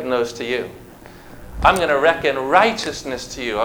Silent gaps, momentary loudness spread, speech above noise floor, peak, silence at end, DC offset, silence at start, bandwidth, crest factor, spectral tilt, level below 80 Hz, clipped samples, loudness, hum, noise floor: none; 12 LU; 22 dB; 0 dBFS; 0 s; under 0.1%; 0 s; over 20 kHz; 20 dB; -3.5 dB/octave; -40 dBFS; under 0.1%; -18 LUFS; none; -40 dBFS